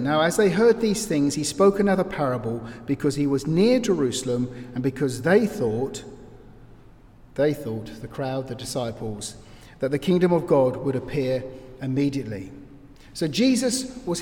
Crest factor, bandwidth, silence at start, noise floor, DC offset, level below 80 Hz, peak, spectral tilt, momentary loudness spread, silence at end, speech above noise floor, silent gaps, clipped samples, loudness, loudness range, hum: 18 dB; 18 kHz; 0 s; -49 dBFS; under 0.1%; -50 dBFS; -6 dBFS; -5.5 dB/octave; 14 LU; 0 s; 26 dB; none; under 0.1%; -23 LUFS; 8 LU; none